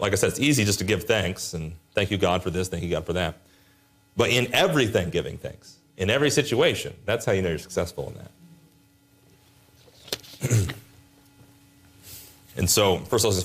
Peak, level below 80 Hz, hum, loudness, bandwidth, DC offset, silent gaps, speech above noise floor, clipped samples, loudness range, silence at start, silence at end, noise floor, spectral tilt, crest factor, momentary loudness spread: -8 dBFS; -52 dBFS; none; -24 LUFS; 15.5 kHz; under 0.1%; none; 35 dB; under 0.1%; 9 LU; 0 s; 0 s; -59 dBFS; -4 dB/octave; 18 dB; 16 LU